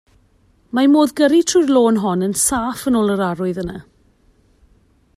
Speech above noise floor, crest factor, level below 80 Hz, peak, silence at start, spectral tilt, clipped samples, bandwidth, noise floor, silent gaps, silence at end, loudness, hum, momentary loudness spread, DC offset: 40 dB; 16 dB; -48 dBFS; -2 dBFS; 0.75 s; -4.5 dB/octave; under 0.1%; 15 kHz; -56 dBFS; none; 1.35 s; -16 LUFS; none; 10 LU; under 0.1%